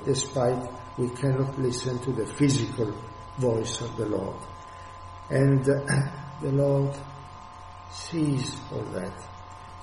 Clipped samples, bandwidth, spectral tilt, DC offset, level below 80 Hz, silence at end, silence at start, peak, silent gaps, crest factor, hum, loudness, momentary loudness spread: under 0.1%; 11.5 kHz; -6 dB/octave; under 0.1%; -52 dBFS; 0 s; 0 s; -10 dBFS; none; 18 dB; none; -27 LUFS; 19 LU